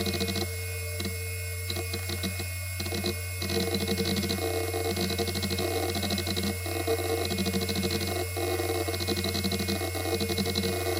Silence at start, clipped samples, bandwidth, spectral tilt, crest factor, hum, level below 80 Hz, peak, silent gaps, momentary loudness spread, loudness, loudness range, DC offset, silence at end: 0 s; under 0.1%; 17 kHz; -4 dB/octave; 18 dB; none; -50 dBFS; -12 dBFS; none; 4 LU; -29 LUFS; 3 LU; under 0.1%; 0 s